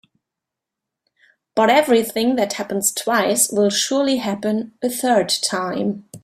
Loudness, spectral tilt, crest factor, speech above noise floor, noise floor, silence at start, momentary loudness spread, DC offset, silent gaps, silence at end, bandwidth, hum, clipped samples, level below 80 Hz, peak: -18 LUFS; -3 dB/octave; 18 dB; 66 dB; -84 dBFS; 1.55 s; 8 LU; under 0.1%; none; 0.05 s; 16 kHz; none; under 0.1%; -64 dBFS; -2 dBFS